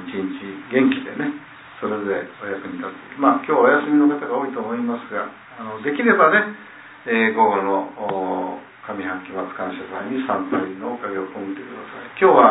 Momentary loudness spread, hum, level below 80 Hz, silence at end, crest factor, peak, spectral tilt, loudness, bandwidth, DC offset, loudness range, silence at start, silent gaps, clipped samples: 17 LU; none; -66 dBFS; 0 s; 20 dB; -2 dBFS; -9.5 dB/octave; -21 LUFS; 4 kHz; under 0.1%; 7 LU; 0 s; none; under 0.1%